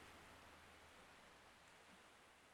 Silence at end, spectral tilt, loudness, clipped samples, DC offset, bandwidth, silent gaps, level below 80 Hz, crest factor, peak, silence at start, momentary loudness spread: 0 s; -3 dB/octave; -64 LUFS; under 0.1%; under 0.1%; 16 kHz; none; -80 dBFS; 16 dB; -48 dBFS; 0 s; 3 LU